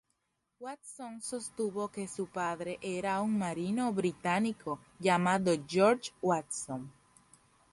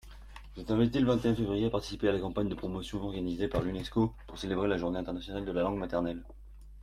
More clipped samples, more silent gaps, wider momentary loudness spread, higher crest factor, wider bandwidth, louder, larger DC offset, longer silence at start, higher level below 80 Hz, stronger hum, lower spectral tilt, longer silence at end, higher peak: neither; neither; first, 16 LU vs 10 LU; about the same, 20 dB vs 18 dB; second, 11.5 kHz vs 14 kHz; about the same, -33 LUFS vs -32 LUFS; neither; first, 0.6 s vs 0.05 s; second, -70 dBFS vs -48 dBFS; neither; second, -5 dB/octave vs -7 dB/octave; first, 0.8 s vs 0 s; about the same, -14 dBFS vs -14 dBFS